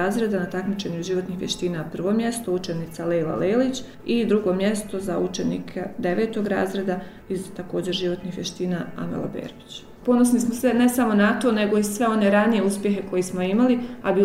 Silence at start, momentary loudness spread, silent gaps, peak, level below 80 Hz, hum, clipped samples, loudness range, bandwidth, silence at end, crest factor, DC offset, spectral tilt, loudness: 0 s; 11 LU; none; -4 dBFS; -52 dBFS; none; under 0.1%; 6 LU; 16 kHz; 0 s; 18 dB; under 0.1%; -5.5 dB/octave; -23 LUFS